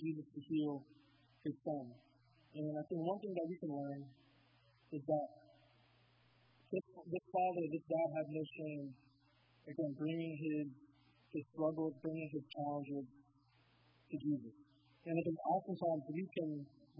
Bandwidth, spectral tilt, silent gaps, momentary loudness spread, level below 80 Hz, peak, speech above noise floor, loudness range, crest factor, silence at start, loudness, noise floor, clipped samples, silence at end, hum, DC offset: 5.2 kHz; -7 dB/octave; none; 11 LU; -84 dBFS; -24 dBFS; 31 dB; 4 LU; 18 dB; 0 s; -43 LUFS; -73 dBFS; under 0.1%; 0 s; none; under 0.1%